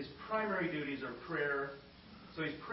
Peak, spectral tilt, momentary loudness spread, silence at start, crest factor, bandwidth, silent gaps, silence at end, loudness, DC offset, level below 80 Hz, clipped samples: -24 dBFS; -3.5 dB/octave; 17 LU; 0 s; 16 dB; 5.6 kHz; none; 0 s; -38 LUFS; under 0.1%; -68 dBFS; under 0.1%